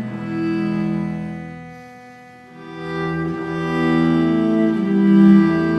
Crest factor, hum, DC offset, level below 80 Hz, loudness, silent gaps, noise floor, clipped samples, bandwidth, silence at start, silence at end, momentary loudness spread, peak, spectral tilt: 16 dB; none; under 0.1%; -50 dBFS; -18 LUFS; none; -41 dBFS; under 0.1%; 6.2 kHz; 0 s; 0 s; 21 LU; -2 dBFS; -9 dB/octave